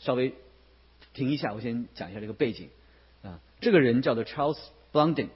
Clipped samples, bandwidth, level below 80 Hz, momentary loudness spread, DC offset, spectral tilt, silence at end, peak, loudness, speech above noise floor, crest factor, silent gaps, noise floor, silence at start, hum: under 0.1%; 5.8 kHz; -60 dBFS; 24 LU; under 0.1%; -10.5 dB/octave; 0.05 s; -8 dBFS; -28 LUFS; 31 dB; 20 dB; none; -58 dBFS; 0 s; none